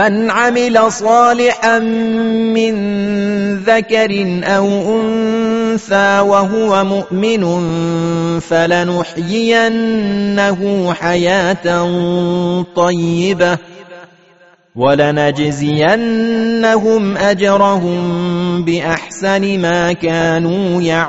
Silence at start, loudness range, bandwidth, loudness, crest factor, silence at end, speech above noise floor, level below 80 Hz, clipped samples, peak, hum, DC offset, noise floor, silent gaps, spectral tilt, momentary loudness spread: 0 s; 2 LU; 8 kHz; -13 LUFS; 12 dB; 0 s; 34 dB; -48 dBFS; under 0.1%; 0 dBFS; none; 0.4%; -47 dBFS; none; -4.5 dB/octave; 5 LU